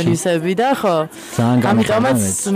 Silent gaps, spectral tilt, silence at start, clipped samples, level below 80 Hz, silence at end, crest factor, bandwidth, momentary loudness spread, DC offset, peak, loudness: none; -5 dB/octave; 0 s; under 0.1%; -52 dBFS; 0 s; 16 dB; 15.5 kHz; 5 LU; under 0.1%; 0 dBFS; -16 LUFS